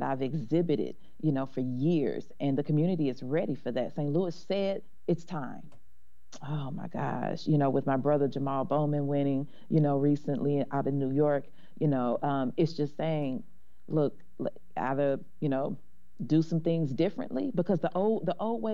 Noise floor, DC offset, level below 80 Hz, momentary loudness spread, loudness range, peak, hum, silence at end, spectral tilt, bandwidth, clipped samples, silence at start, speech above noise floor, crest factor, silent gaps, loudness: -68 dBFS; 1%; -68 dBFS; 9 LU; 5 LU; -14 dBFS; none; 0 s; -9 dB/octave; 7.2 kHz; under 0.1%; 0 s; 38 dB; 16 dB; none; -30 LUFS